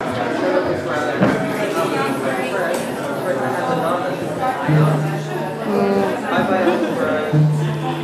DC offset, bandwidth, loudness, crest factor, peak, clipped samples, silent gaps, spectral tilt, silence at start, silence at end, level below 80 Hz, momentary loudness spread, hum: under 0.1%; 14.5 kHz; -19 LUFS; 16 dB; -2 dBFS; under 0.1%; none; -6.5 dB/octave; 0 s; 0 s; -56 dBFS; 6 LU; none